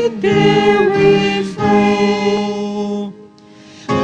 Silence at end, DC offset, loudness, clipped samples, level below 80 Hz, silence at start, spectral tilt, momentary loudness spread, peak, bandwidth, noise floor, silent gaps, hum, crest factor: 0 s; under 0.1%; -14 LUFS; under 0.1%; -48 dBFS; 0 s; -6 dB/octave; 10 LU; 0 dBFS; 9.4 kHz; -41 dBFS; none; none; 14 dB